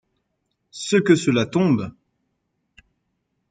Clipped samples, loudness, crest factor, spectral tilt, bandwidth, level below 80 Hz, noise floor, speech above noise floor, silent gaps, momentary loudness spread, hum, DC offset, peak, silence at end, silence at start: under 0.1%; -19 LUFS; 20 dB; -5.5 dB/octave; 9.4 kHz; -62 dBFS; -74 dBFS; 55 dB; none; 17 LU; none; under 0.1%; -2 dBFS; 1.6 s; 0.75 s